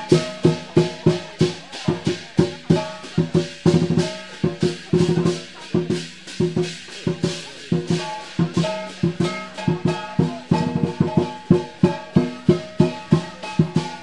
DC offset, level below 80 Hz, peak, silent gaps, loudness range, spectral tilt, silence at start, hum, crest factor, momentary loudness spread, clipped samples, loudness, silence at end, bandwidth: 0.4%; -54 dBFS; -2 dBFS; none; 3 LU; -6.5 dB/octave; 0 s; none; 20 dB; 7 LU; under 0.1%; -22 LUFS; 0 s; 11 kHz